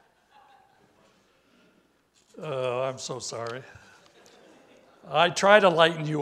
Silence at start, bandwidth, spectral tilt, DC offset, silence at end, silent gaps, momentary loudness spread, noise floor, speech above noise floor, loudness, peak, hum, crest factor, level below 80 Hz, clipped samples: 2.35 s; 12.5 kHz; -4 dB/octave; under 0.1%; 0 s; none; 18 LU; -65 dBFS; 41 dB; -24 LUFS; -2 dBFS; none; 26 dB; -74 dBFS; under 0.1%